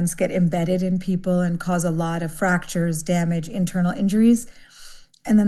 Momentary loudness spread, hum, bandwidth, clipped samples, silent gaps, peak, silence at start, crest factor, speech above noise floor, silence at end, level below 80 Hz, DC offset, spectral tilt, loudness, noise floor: 6 LU; none; 12.5 kHz; under 0.1%; none; -8 dBFS; 0 s; 14 dB; 22 dB; 0 s; -46 dBFS; under 0.1%; -6.5 dB/octave; -22 LUFS; -43 dBFS